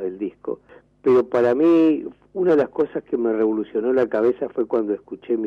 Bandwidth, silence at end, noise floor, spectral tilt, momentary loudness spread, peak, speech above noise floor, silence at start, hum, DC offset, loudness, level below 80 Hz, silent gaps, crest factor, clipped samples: 5.6 kHz; 0 s; -50 dBFS; -8.5 dB/octave; 13 LU; -10 dBFS; 30 dB; 0 s; none; under 0.1%; -20 LUFS; -60 dBFS; none; 10 dB; under 0.1%